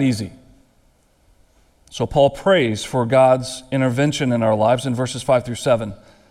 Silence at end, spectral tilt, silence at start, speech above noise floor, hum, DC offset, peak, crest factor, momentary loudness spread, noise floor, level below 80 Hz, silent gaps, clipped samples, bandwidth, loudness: 0.35 s; -5.5 dB/octave; 0 s; 40 dB; none; under 0.1%; -2 dBFS; 18 dB; 11 LU; -58 dBFS; -48 dBFS; none; under 0.1%; 14.5 kHz; -18 LUFS